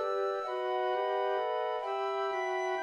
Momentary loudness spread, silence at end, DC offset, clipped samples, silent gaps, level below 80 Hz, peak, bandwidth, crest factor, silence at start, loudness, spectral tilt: 2 LU; 0 s; under 0.1%; under 0.1%; none; -80 dBFS; -22 dBFS; 10.5 kHz; 12 dB; 0 s; -33 LUFS; -2.5 dB/octave